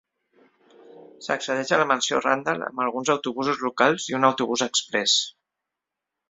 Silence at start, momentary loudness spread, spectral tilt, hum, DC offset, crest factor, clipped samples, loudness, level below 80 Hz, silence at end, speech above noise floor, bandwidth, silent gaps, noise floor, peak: 0.95 s; 7 LU; -2.5 dB/octave; none; under 0.1%; 22 dB; under 0.1%; -23 LUFS; -70 dBFS; 1 s; 62 dB; 8.2 kHz; none; -85 dBFS; -2 dBFS